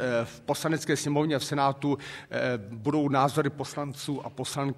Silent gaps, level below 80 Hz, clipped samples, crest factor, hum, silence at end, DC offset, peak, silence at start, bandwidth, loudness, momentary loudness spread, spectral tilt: none; -66 dBFS; under 0.1%; 20 dB; none; 0 s; under 0.1%; -10 dBFS; 0 s; 14.5 kHz; -29 LUFS; 9 LU; -5 dB/octave